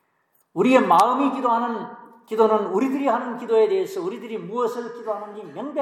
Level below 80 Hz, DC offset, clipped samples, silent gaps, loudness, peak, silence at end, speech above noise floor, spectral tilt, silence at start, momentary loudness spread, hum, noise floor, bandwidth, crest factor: -82 dBFS; under 0.1%; under 0.1%; none; -21 LUFS; -2 dBFS; 0 s; 45 dB; -5.5 dB/octave; 0.55 s; 15 LU; none; -67 dBFS; 16 kHz; 20 dB